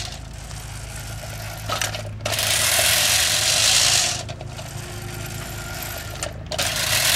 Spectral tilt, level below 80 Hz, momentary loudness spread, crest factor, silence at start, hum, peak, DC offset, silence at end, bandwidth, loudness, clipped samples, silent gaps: -1 dB/octave; -40 dBFS; 18 LU; 20 dB; 0 s; none; -4 dBFS; under 0.1%; 0 s; 17.5 kHz; -19 LUFS; under 0.1%; none